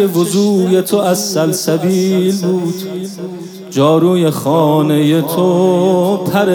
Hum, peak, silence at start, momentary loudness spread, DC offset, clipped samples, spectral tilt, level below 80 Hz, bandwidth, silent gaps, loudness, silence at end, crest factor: none; 0 dBFS; 0 s; 10 LU; under 0.1%; under 0.1%; -6 dB/octave; -64 dBFS; 18 kHz; none; -13 LUFS; 0 s; 12 dB